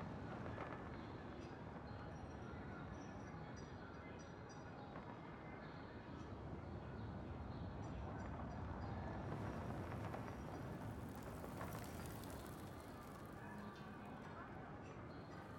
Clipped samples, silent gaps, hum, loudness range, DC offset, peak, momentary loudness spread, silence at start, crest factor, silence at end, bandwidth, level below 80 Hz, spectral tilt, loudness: under 0.1%; none; none; 5 LU; under 0.1%; -34 dBFS; 6 LU; 0 s; 16 dB; 0 s; 19 kHz; -62 dBFS; -6.5 dB/octave; -52 LUFS